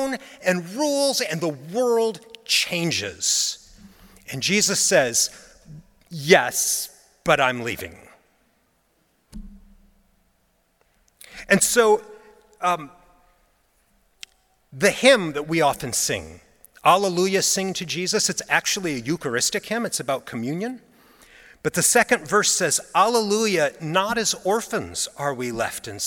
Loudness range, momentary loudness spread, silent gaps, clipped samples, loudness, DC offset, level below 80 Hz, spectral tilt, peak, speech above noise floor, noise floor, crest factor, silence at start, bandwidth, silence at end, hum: 5 LU; 11 LU; none; under 0.1%; -21 LUFS; under 0.1%; -56 dBFS; -2.5 dB/octave; 0 dBFS; 44 dB; -66 dBFS; 22 dB; 0 s; 18 kHz; 0 s; none